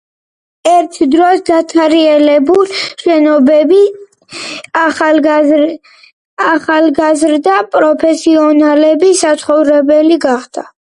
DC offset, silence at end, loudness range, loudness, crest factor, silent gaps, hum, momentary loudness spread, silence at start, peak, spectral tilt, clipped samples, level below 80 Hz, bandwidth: under 0.1%; 0.2 s; 3 LU; -9 LUFS; 10 dB; 6.13-6.37 s; none; 8 LU; 0.65 s; 0 dBFS; -3 dB/octave; under 0.1%; -56 dBFS; 11 kHz